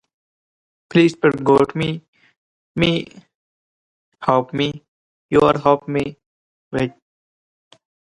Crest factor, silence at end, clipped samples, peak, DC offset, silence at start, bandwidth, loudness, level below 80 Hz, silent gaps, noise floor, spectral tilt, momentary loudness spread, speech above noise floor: 20 dB; 1.3 s; under 0.1%; 0 dBFS; under 0.1%; 0.95 s; 11 kHz; -18 LUFS; -52 dBFS; 2.08-2.13 s, 2.37-2.75 s, 3.35-4.12 s, 4.88-5.29 s, 6.26-6.71 s; under -90 dBFS; -6.5 dB/octave; 14 LU; over 73 dB